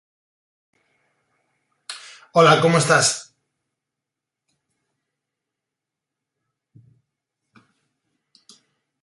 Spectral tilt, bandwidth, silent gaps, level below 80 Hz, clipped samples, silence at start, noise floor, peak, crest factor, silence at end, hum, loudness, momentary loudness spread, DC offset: -3.5 dB/octave; 11.5 kHz; none; -66 dBFS; under 0.1%; 1.9 s; -85 dBFS; -2 dBFS; 24 dB; 5.8 s; none; -16 LUFS; 23 LU; under 0.1%